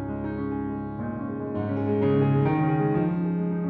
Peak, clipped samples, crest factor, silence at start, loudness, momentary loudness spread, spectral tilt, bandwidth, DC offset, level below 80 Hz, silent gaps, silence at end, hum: -12 dBFS; under 0.1%; 14 dB; 0 s; -26 LUFS; 10 LU; -12 dB/octave; 4.4 kHz; under 0.1%; -50 dBFS; none; 0 s; none